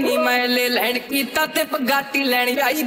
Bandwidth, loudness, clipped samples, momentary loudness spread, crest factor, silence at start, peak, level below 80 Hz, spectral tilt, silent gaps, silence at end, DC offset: 16.5 kHz; -19 LUFS; under 0.1%; 3 LU; 14 dB; 0 s; -4 dBFS; -64 dBFS; -1.5 dB/octave; none; 0 s; under 0.1%